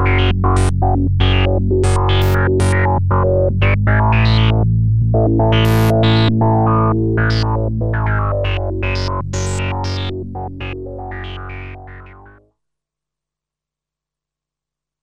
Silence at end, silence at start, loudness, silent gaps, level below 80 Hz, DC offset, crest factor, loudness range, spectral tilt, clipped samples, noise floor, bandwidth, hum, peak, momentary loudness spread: 2.9 s; 0 s; -15 LUFS; none; -24 dBFS; under 0.1%; 14 dB; 16 LU; -6.5 dB/octave; under 0.1%; -86 dBFS; 15.5 kHz; 60 Hz at -50 dBFS; -2 dBFS; 14 LU